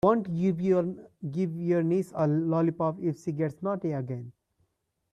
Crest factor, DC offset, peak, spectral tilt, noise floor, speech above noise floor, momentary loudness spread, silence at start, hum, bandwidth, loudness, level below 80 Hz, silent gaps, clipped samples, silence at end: 18 dB; under 0.1%; -10 dBFS; -9.5 dB/octave; -76 dBFS; 49 dB; 10 LU; 0.05 s; none; 11 kHz; -29 LUFS; -66 dBFS; none; under 0.1%; 0.8 s